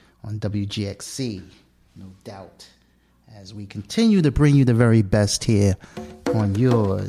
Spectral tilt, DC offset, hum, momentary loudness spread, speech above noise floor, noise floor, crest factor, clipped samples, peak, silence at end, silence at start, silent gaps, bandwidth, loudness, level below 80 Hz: -6.5 dB/octave; under 0.1%; none; 23 LU; 37 dB; -58 dBFS; 18 dB; under 0.1%; -4 dBFS; 0 s; 0.25 s; none; 14 kHz; -20 LUFS; -40 dBFS